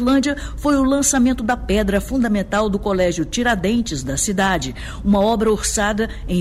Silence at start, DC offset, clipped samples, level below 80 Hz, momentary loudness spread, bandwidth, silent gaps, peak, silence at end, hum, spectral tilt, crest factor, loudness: 0 s; under 0.1%; under 0.1%; -32 dBFS; 7 LU; 15.5 kHz; none; -6 dBFS; 0 s; none; -4.5 dB/octave; 12 dB; -18 LUFS